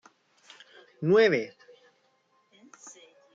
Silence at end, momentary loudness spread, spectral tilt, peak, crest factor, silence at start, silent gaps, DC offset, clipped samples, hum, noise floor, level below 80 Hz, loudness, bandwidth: 0.45 s; 27 LU; -6 dB/octave; -10 dBFS; 20 dB; 1 s; none; under 0.1%; under 0.1%; none; -69 dBFS; -76 dBFS; -24 LUFS; 7.6 kHz